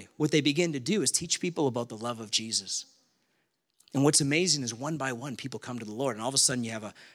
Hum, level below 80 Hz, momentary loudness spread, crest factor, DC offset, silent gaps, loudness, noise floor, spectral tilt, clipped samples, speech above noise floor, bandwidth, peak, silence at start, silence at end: none; -72 dBFS; 13 LU; 20 dB; under 0.1%; none; -28 LUFS; -76 dBFS; -3 dB/octave; under 0.1%; 47 dB; 16 kHz; -10 dBFS; 0 s; 0.05 s